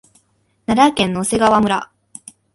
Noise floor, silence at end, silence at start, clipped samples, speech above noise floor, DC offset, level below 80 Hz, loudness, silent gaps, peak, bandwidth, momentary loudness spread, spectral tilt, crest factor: -61 dBFS; 0.7 s; 0.7 s; under 0.1%; 46 dB; under 0.1%; -48 dBFS; -16 LUFS; none; 0 dBFS; 11.5 kHz; 23 LU; -4.5 dB/octave; 18 dB